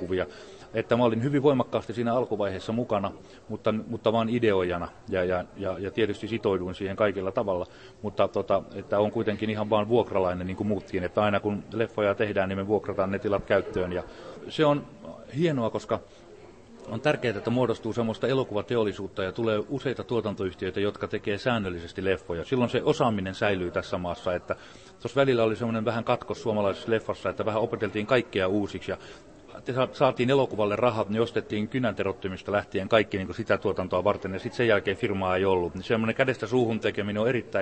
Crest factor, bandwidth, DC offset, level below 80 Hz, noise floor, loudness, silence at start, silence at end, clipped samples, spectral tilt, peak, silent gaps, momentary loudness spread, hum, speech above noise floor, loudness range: 20 dB; 8.8 kHz; under 0.1%; -56 dBFS; -49 dBFS; -27 LUFS; 0 s; 0 s; under 0.1%; -7 dB/octave; -6 dBFS; none; 8 LU; none; 22 dB; 3 LU